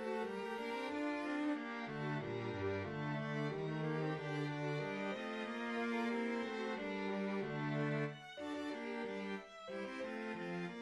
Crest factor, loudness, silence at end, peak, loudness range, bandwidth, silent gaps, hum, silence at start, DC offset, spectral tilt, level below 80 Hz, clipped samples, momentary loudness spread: 14 dB; -42 LUFS; 0 s; -28 dBFS; 2 LU; 11.5 kHz; none; none; 0 s; under 0.1%; -6.5 dB/octave; -76 dBFS; under 0.1%; 5 LU